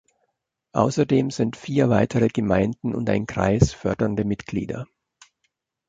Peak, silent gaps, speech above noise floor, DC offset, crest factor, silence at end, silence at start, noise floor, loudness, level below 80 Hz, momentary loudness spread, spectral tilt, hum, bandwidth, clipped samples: -2 dBFS; none; 54 dB; under 0.1%; 20 dB; 1.05 s; 0.75 s; -75 dBFS; -22 LUFS; -42 dBFS; 9 LU; -7 dB/octave; none; 9.2 kHz; under 0.1%